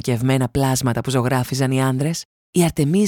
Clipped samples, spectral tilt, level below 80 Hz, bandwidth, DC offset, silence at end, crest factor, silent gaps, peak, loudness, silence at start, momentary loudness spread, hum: under 0.1%; -5.5 dB/octave; -44 dBFS; 18 kHz; under 0.1%; 0 s; 14 dB; 2.25-2.53 s; -4 dBFS; -20 LUFS; 0.05 s; 5 LU; none